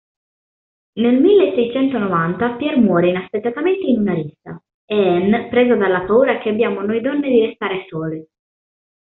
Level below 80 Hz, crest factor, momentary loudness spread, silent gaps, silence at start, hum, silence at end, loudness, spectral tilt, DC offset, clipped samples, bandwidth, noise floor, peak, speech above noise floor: -56 dBFS; 14 dB; 11 LU; 4.74-4.88 s; 0.95 s; none; 0.75 s; -17 LUFS; -5.5 dB/octave; under 0.1%; under 0.1%; 4.1 kHz; under -90 dBFS; -2 dBFS; over 74 dB